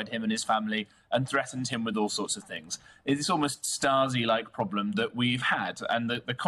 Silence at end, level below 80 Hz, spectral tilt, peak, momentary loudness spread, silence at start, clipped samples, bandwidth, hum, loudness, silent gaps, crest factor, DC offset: 0 s; -68 dBFS; -3.5 dB/octave; -14 dBFS; 7 LU; 0 s; under 0.1%; 13 kHz; none; -29 LUFS; none; 16 dB; under 0.1%